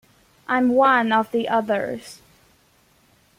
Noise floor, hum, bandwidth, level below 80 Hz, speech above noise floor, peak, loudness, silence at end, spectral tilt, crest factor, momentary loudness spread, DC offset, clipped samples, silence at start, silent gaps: -59 dBFS; none; 15 kHz; -64 dBFS; 39 dB; -4 dBFS; -20 LUFS; 1.25 s; -5 dB/octave; 18 dB; 19 LU; under 0.1%; under 0.1%; 0.5 s; none